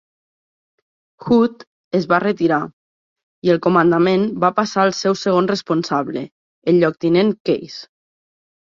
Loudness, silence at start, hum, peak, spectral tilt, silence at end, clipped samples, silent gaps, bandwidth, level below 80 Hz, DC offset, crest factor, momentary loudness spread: -17 LUFS; 1.2 s; none; -2 dBFS; -6 dB/octave; 0.9 s; under 0.1%; 1.67-1.91 s, 2.73-3.16 s, 3.23-3.42 s, 6.32-6.62 s, 7.40-7.45 s; 7.4 kHz; -60 dBFS; under 0.1%; 16 dB; 12 LU